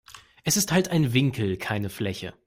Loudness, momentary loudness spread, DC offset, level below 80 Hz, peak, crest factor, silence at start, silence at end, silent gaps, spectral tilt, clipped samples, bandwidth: -25 LUFS; 9 LU; under 0.1%; -56 dBFS; -8 dBFS; 18 dB; 0.1 s; 0.15 s; none; -4.5 dB/octave; under 0.1%; 16 kHz